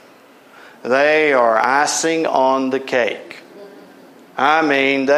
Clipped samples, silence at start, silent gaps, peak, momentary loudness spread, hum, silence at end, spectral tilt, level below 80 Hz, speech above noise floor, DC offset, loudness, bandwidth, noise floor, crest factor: under 0.1%; 0.85 s; none; -2 dBFS; 18 LU; none; 0 s; -2.5 dB/octave; -72 dBFS; 30 dB; under 0.1%; -16 LUFS; 14.5 kHz; -46 dBFS; 16 dB